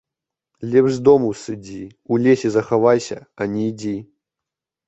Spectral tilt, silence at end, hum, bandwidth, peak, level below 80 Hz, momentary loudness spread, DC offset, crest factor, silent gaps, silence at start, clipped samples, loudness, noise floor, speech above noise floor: -6.5 dB/octave; 0.85 s; none; 8.2 kHz; -2 dBFS; -58 dBFS; 16 LU; under 0.1%; 18 dB; none; 0.6 s; under 0.1%; -18 LUFS; -86 dBFS; 68 dB